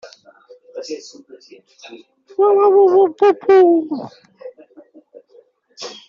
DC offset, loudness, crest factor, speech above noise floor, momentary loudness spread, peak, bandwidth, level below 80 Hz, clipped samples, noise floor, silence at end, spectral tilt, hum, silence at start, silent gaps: under 0.1%; -13 LUFS; 16 dB; 36 dB; 22 LU; -2 dBFS; 7.2 kHz; -68 dBFS; under 0.1%; -51 dBFS; 0.15 s; -3.5 dB/octave; none; 0.05 s; none